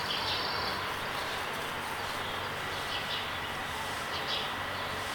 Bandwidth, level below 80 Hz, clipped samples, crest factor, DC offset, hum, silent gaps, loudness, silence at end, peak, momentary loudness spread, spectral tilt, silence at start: 19 kHz; -56 dBFS; under 0.1%; 16 dB; under 0.1%; none; none; -33 LUFS; 0 s; -20 dBFS; 4 LU; -2.5 dB/octave; 0 s